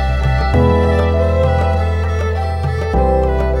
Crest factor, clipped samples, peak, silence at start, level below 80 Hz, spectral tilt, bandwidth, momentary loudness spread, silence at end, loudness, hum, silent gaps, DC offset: 12 dB; under 0.1%; -2 dBFS; 0 s; -18 dBFS; -8 dB/octave; 7.6 kHz; 5 LU; 0 s; -15 LUFS; none; none; under 0.1%